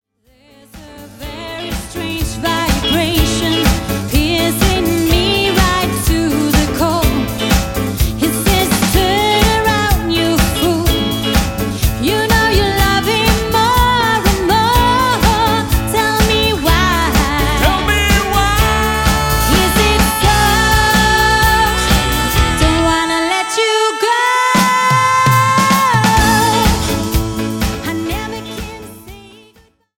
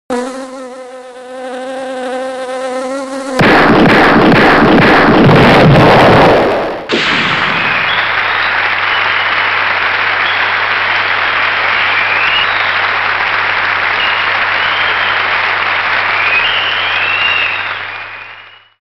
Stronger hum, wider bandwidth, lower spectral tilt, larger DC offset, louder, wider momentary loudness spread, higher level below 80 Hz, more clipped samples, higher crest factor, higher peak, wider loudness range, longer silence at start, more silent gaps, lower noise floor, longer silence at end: neither; first, 17 kHz vs 15 kHz; second, -4 dB/octave vs -5.5 dB/octave; neither; second, -13 LUFS vs -9 LUFS; second, 8 LU vs 16 LU; first, -22 dBFS vs -36 dBFS; neither; about the same, 12 dB vs 10 dB; about the same, 0 dBFS vs 0 dBFS; about the same, 4 LU vs 5 LU; first, 0.75 s vs 0.1 s; neither; first, -51 dBFS vs -35 dBFS; first, 0.7 s vs 0.35 s